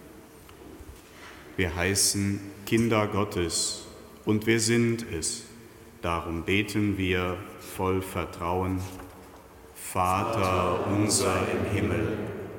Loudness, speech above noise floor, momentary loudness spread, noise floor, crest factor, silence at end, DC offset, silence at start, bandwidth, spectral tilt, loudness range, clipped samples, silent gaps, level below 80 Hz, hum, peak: -27 LUFS; 22 dB; 22 LU; -49 dBFS; 18 dB; 0 s; under 0.1%; 0 s; 17.5 kHz; -4 dB/octave; 3 LU; under 0.1%; none; -50 dBFS; none; -10 dBFS